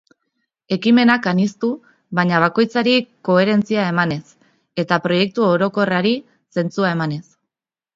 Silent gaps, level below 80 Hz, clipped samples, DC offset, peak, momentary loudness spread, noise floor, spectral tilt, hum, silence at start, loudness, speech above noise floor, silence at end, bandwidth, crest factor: none; -62 dBFS; under 0.1%; under 0.1%; 0 dBFS; 10 LU; -85 dBFS; -6.5 dB/octave; none; 0.7 s; -18 LUFS; 68 dB; 0.75 s; 7.6 kHz; 18 dB